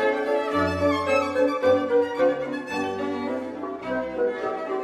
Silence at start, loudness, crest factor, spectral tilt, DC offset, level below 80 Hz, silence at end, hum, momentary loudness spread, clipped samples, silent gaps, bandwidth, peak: 0 s; -24 LUFS; 14 dB; -6 dB/octave; under 0.1%; -62 dBFS; 0 s; none; 8 LU; under 0.1%; none; 12.5 kHz; -10 dBFS